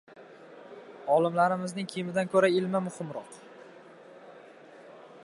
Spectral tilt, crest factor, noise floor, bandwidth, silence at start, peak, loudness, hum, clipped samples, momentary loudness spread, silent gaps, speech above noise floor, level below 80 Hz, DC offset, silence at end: -6 dB/octave; 20 dB; -51 dBFS; 11.5 kHz; 0.15 s; -10 dBFS; -28 LUFS; none; under 0.1%; 26 LU; none; 24 dB; -80 dBFS; under 0.1%; 0 s